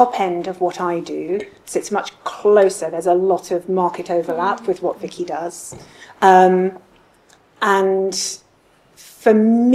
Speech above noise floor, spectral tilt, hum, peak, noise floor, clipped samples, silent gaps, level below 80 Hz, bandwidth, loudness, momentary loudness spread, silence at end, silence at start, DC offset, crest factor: 38 dB; -5 dB/octave; none; 0 dBFS; -55 dBFS; under 0.1%; none; -62 dBFS; 14.5 kHz; -18 LUFS; 13 LU; 0 s; 0 s; under 0.1%; 18 dB